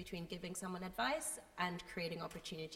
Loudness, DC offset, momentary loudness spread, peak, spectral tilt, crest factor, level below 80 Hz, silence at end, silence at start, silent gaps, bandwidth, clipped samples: -43 LUFS; under 0.1%; 8 LU; -24 dBFS; -3.5 dB/octave; 20 dB; -66 dBFS; 0 s; 0 s; none; 16 kHz; under 0.1%